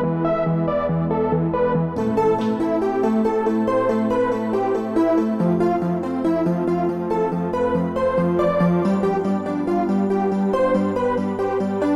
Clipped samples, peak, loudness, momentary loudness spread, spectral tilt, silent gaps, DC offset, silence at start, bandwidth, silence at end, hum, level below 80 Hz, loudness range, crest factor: under 0.1%; -8 dBFS; -20 LUFS; 3 LU; -9 dB/octave; none; under 0.1%; 0 s; 10.5 kHz; 0 s; none; -48 dBFS; 1 LU; 12 dB